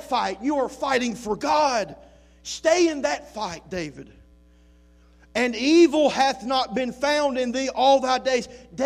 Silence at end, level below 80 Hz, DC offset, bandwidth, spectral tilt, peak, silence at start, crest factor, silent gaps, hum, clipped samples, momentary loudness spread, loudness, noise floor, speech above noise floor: 0 s; -54 dBFS; under 0.1%; 12.5 kHz; -3.5 dB/octave; -6 dBFS; 0 s; 16 dB; none; none; under 0.1%; 14 LU; -22 LUFS; -54 dBFS; 31 dB